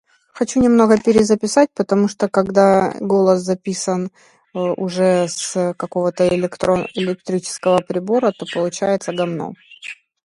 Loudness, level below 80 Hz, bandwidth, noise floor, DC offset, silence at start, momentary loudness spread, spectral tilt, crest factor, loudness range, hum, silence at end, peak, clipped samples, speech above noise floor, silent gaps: -17 LUFS; -52 dBFS; 11.5 kHz; -37 dBFS; under 0.1%; 0.35 s; 11 LU; -5.5 dB/octave; 16 dB; 5 LU; none; 0.3 s; 0 dBFS; under 0.1%; 20 dB; none